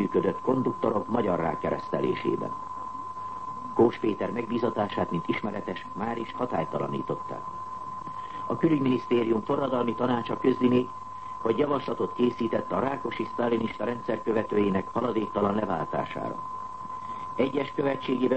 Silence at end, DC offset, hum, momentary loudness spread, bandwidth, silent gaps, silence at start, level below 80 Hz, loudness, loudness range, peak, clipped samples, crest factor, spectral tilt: 0 s; 0.4%; none; 12 LU; 8.6 kHz; none; 0 s; -60 dBFS; -29 LUFS; 4 LU; -10 dBFS; under 0.1%; 18 dB; -8 dB/octave